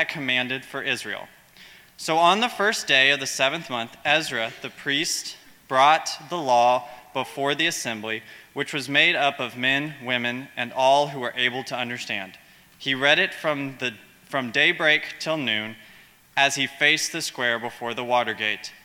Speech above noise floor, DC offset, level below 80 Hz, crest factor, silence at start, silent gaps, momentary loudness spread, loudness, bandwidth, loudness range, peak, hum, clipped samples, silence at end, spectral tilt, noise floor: 28 dB; under 0.1%; -70 dBFS; 22 dB; 0 s; none; 12 LU; -23 LUFS; 18.5 kHz; 3 LU; -2 dBFS; none; under 0.1%; 0.1 s; -2.5 dB/octave; -52 dBFS